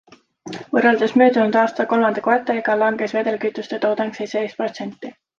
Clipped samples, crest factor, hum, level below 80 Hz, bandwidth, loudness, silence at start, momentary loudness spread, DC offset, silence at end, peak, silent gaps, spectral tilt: under 0.1%; 18 dB; none; -68 dBFS; 7.4 kHz; -19 LUFS; 0.45 s; 13 LU; under 0.1%; 0.25 s; -2 dBFS; none; -5.5 dB/octave